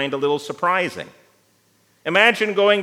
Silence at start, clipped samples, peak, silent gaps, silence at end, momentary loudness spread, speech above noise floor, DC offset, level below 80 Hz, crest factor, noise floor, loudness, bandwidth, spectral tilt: 0 s; under 0.1%; -2 dBFS; none; 0 s; 17 LU; 41 dB; under 0.1%; -76 dBFS; 20 dB; -60 dBFS; -18 LUFS; 15 kHz; -4 dB/octave